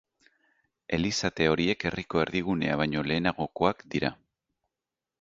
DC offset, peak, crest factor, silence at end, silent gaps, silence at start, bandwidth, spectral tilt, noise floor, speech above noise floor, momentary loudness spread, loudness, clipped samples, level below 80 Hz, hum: under 0.1%; -6 dBFS; 22 dB; 1.1 s; none; 0.9 s; 8 kHz; -5 dB/octave; -89 dBFS; 61 dB; 5 LU; -28 LUFS; under 0.1%; -52 dBFS; none